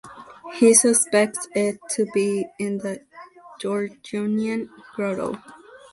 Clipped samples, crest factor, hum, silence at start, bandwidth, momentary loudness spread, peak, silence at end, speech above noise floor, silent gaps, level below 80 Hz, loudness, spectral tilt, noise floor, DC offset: under 0.1%; 22 dB; none; 0.05 s; 12 kHz; 20 LU; 0 dBFS; 0.15 s; 23 dB; none; -66 dBFS; -22 LUFS; -3.5 dB/octave; -45 dBFS; under 0.1%